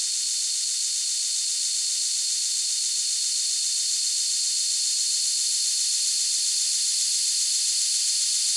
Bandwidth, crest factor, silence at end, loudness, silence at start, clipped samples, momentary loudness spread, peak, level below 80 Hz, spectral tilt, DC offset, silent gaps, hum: 12 kHz; 14 dB; 0 s; -21 LUFS; 0 s; under 0.1%; 2 LU; -10 dBFS; under -90 dBFS; 12.5 dB/octave; under 0.1%; none; none